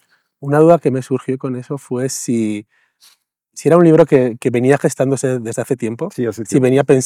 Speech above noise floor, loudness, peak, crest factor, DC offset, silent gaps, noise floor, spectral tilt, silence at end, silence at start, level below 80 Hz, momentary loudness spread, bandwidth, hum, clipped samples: 41 dB; -15 LUFS; 0 dBFS; 16 dB; under 0.1%; none; -55 dBFS; -6.5 dB/octave; 0 s; 0.4 s; -60 dBFS; 12 LU; 15 kHz; none; 0.2%